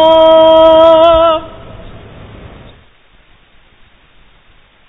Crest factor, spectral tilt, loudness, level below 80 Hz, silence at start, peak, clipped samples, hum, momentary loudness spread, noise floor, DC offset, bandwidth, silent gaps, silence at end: 10 dB; -6.5 dB/octave; -6 LUFS; -36 dBFS; 0 s; 0 dBFS; 0.4%; none; 11 LU; -45 dBFS; under 0.1%; 4 kHz; none; 3 s